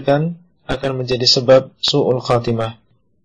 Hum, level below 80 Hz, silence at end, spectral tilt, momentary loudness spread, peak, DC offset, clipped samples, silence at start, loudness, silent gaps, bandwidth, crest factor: none; -44 dBFS; 0.5 s; -5 dB/octave; 13 LU; 0 dBFS; under 0.1%; under 0.1%; 0 s; -16 LUFS; none; 9.8 kHz; 16 dB